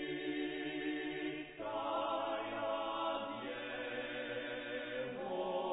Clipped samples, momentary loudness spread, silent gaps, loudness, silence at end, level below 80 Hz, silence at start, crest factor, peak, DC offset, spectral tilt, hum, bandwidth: under 0.1%; 5 LU; none; -40 LUFS; 0 s; -70 dBFS; 0 s; 14 dB; -26 dBFS; under 0.1%; -2 dB/octave; none; 4 kHz